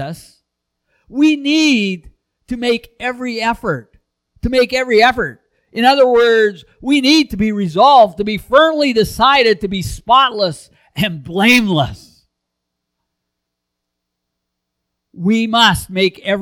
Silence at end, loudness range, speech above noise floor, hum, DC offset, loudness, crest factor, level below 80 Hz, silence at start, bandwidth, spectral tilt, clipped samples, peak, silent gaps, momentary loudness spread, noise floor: 0 s; 7 LU; 64 dB; 60 Hz at -50 dBFS; under 0.1%; -13 LUFS; 16 dB; -40 dBFS; 0 s; 19 kHz; -4.5 dB/octave; under 0.1%; 0 dBFS; none; 13 LU; -77 dBFS